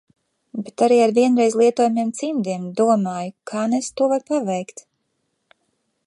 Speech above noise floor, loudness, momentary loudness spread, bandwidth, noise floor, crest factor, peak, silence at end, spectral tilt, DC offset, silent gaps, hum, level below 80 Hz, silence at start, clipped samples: 53 dB; -19 LUFS; 13 LU; 11.5 kHz; -72 dBFS; 16 dB; -4 dBFS; 1.25 s; -5.5 dB/octave; under 0.1%; none; none; -72 dBFS; 0.55 s; under 0.1%